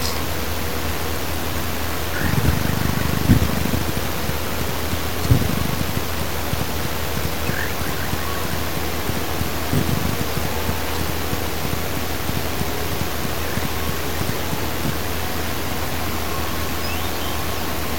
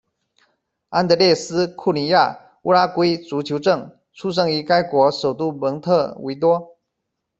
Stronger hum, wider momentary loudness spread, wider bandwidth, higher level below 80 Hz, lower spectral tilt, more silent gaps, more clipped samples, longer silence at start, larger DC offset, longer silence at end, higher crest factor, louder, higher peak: neither; second, 5 LU vs 8 LU; first, 17 kHz vs 8 kHz; first, -32 dBFS vs -62 dBFS; about the same, -4.5 dB/octave vs -5.5 dB/octave; neither; neither; second, 0 s vs 0.9 s; first, 6% vs under 0.1%; second, 0 s vs 0.75 s; about the same, 22 dB vs 18 dB; second, -23 LUFS vs -19 LUFS; about the same, 0 dBFS vs -2 dBFS